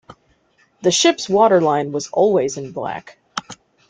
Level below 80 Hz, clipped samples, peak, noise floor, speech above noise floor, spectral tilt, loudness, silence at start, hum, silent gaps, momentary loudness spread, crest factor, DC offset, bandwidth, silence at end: -62 dBFS; under 0.1%; -2 dBFS; -59 dBFS; 42 dB; -3.5 dB/octave; -17 LUFS; 0.1 s; none; none; 16 LU; 16 dB; under 0.1%; 9.6 kHz; 0.35 s